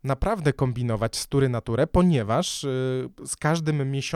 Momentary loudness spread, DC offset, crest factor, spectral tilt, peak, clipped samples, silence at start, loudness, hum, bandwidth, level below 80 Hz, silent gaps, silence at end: 6 LU; under 0.1%; 18 dB; -5.5 dB/octave; -6 dBFS; under 0.1%; 0.05 s; -25 LUFS; none; 15 kHz; -38 dBFS; none; 0 s